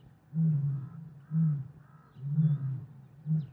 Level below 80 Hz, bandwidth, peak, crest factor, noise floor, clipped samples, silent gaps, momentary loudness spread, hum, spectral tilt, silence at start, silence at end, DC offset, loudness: -70 dBFS; 1.9 kHz; -18 dBFS; 14 dB; -54 dBFS; under 0.1%; none; 17 LU; none; -12 dB/octave; 0.3 s; 0 s; under 0.1%; -32 LUFS